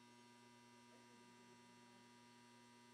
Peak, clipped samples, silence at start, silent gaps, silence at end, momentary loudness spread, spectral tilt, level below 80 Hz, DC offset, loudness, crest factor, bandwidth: -54 dBFS; under 0.1%; 0 s; none; 0 s; 0 LU; -3.5 dB/octave; under -90 dBFS; under 0.1%; -66 LUFS; 12 dB; 13 kHz